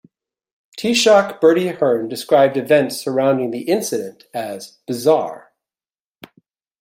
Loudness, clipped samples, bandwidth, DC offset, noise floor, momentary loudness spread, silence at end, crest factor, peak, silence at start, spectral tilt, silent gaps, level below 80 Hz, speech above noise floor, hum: -17 LUFS; under 0.1%; 16.5 kHz; under 0.1%; under -90 dBFS; 15 LU; 1.4 s; 16 dB; -2 dBFS; 0.75 s; -4 dB/octave; none; -66 dBFS; over 73 dB; none